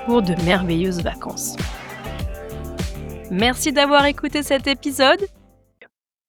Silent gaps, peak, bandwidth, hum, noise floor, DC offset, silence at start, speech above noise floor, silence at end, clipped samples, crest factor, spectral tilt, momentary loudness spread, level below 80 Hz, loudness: none; -2 dBFS; 19.5 kHz; none; -53 dBFS; under 0.1%; 0 s; 34 dB; 0.45 s; under 0.1%; 20 dB; -4 dB/octave; 15 LU; -36 dBFS; -20 LUFS